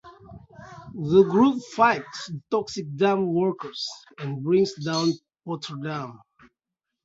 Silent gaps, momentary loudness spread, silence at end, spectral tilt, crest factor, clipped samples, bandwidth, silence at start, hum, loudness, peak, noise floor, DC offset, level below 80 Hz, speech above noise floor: none; 16 LU; 0.9 s; -6 dB/octave; 20 dB; under 0.1%; 7.8 kHz; 0.05 s; none; -24 LUFS; -6 dBFS; -85 dBFS; under 0.1%; -62 dBFS; 62 dB